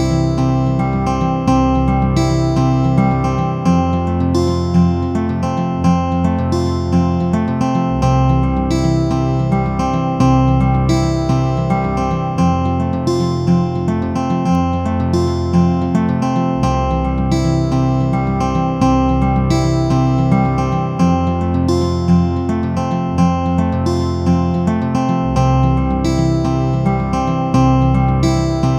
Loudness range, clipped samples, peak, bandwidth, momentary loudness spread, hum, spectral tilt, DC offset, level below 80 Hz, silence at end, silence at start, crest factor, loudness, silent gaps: 1 LU; under 0.1%; 0 dBFS; 10 kHz; 3 LU; none; -7.5 dB/octave; under 0.1%; -26 dBFS; 0 s; 0 s; 14 dB; -16 LUFS; none